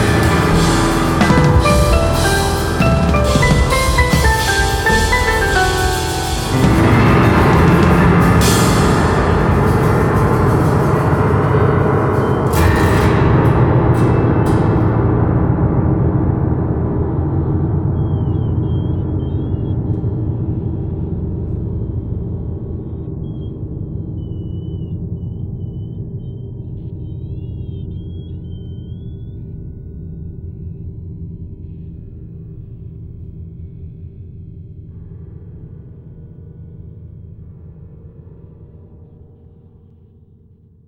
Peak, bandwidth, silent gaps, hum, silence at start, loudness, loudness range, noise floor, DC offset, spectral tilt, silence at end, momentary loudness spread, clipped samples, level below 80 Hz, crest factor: 0 dBFS; 18.5 kHz; none; none; 0 s; -15 LUFS; 21 LU; -47 dBFS; under 0.1%; -6 dB/octave; 1.85 s; 22 LU; under 0.1%; -24 dBFS; 16 dB